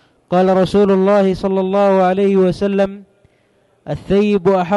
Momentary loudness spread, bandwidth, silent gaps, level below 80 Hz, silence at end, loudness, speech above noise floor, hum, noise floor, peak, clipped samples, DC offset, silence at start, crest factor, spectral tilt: 6 LU; 11 kHz; none; -44 dBFS; 0 s; -14 LUFS; 43 dB; none; -57 dBFS; -4 dBFS; under 0.1%; under 0.1%; 0.3 s; 10 dB; -8 dB/octave